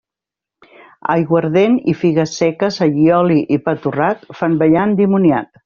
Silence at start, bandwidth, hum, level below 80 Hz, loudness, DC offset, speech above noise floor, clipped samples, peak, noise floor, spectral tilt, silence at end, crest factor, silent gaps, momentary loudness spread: 1.05 s; 7.2 kHz; none; -54 dBFS; -15 LUFS; under 0.1%; 72 dB; under 0.1%; -2 dBFS; -86 dBFS; -6.5 dB/octave; 0.2 s; 12 dB; none; 6 LU